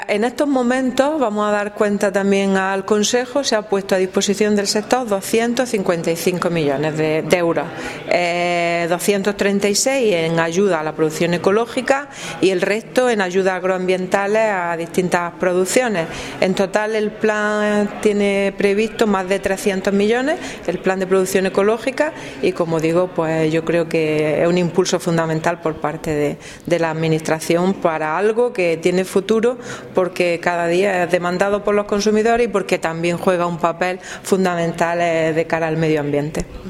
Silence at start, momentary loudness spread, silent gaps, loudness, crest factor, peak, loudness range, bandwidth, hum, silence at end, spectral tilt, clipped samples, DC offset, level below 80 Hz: 0 s; 4 LU; none; -18 LUFS; 18 dB; 0 dBFS; 1 LU; 16 kHz; none; 0 s; -5 dB/octave; under 0.1%; under 0.1%; -48 dBFS